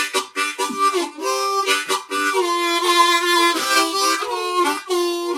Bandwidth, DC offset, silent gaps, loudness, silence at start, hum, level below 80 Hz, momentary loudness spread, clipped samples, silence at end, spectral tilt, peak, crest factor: 16 kHz; under 0.1%; none; -18 LUFS; 0 s; none; -72 dBFS; 7 LU; under 0.1%; 0 s; 0.5 dB/octave; -4 dBFS; 16 dB